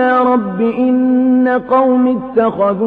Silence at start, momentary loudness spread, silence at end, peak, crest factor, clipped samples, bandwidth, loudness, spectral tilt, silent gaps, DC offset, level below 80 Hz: 0 s; 3 LU; 0 s; -2 dBFS; 10 dB; under 0.1%; 4 kHz; -13 LUFS; -9.5 dB/octave; none; under 0.1%; -52 dBFS